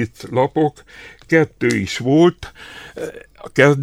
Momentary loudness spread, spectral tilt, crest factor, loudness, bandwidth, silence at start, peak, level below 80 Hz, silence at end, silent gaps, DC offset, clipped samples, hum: 20 LU; -6 dB/octave; 18 dB; -17 LUFS; 14.5 kHz; 0 s; 0 dBFS; -50 dBFS; 0 s; none; under 0.1%; under 0.1%; none